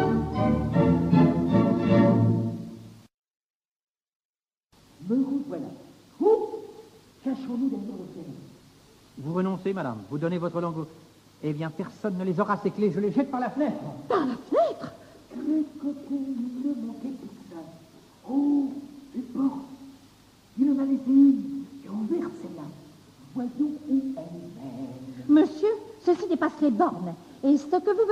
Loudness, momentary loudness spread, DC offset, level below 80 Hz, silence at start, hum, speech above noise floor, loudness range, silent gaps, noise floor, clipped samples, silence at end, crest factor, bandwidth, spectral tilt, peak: -26 LUFS; 19 LU; under 0.1%; -52 dBFS; 0 s; none; 37 dB; 8 LU; 3.14-3.23 s, 3.46-3.60 s, 3.68-3.80 s, 3.90-3.94 s, 4.15-4.34 s, 4.57-4.61 s; -63 dBFS; under 0.1%; 0 s; 18 dB; 9.2 kHz; -9 dB/octave; -8 dBFS